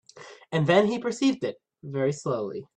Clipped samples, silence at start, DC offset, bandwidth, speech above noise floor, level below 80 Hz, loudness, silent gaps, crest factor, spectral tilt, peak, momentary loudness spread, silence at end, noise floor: under 0.1%; 0.15 s; under 0.1%; 9.8 kHz; 23 dB; -68 dBFS; -26 LUFS; none; 20 dB; -6 dB/octave; -8 dBFS; 14 LU; 0.15 s; -48 dBFS